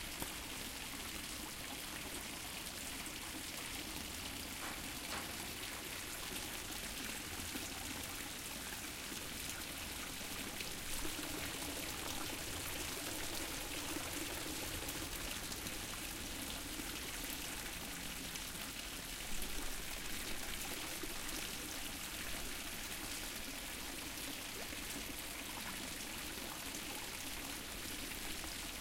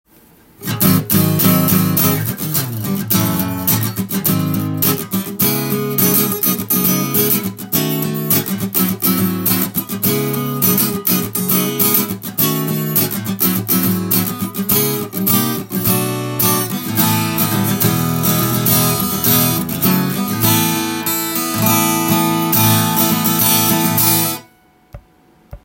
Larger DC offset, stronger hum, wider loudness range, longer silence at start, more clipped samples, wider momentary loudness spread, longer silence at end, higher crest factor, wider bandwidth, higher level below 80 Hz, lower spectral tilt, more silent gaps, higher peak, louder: neither; neither; about the same, 2 LU vs 2 LU; second, 0 s vs 0.6 s; neither; second, 2 LU vs 6 LU; about the same, 0 s vs 0.05 s; about the same, 20 dB vs 16 dB; about the same, 17 kHz vs 17 kHz; about the same, -54 dBFS vs -50 dBFS; second, -2 dB/octave vs -4 dB/octave; neither; second, -24 dBFS vs 0 dBFS; second, -43 LUFS vs -15 LUFS